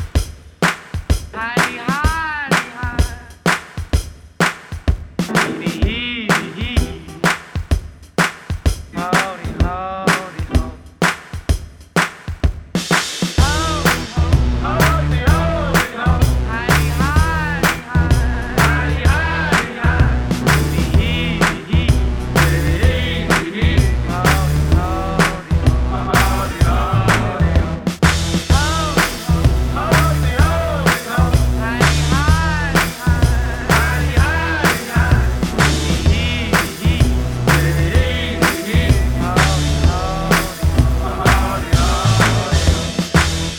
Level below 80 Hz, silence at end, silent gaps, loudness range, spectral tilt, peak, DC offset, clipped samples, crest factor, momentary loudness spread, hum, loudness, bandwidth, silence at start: -20 dBFS; 0 s; none; 4 LU; -5 dB/octave; 0 dBFS; under 0.1%; under 0.1%; 16 dB; 7 LU; none; -17 LUFS; 19.5 kHz; 0 s